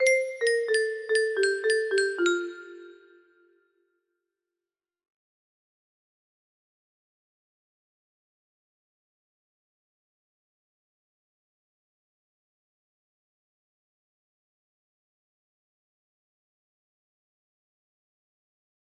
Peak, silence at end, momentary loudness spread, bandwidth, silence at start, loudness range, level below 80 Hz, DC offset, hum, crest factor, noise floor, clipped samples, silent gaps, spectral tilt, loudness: -10 dBFS; 15.95 s; 10 LU; 11.5 kHz; 0 s; 9 LU; -82 dBFS; under 0.1%; none; 22 dB; under -90 dBFS; under 0.1%; none; -0.5 dB/octave; -25 LUFS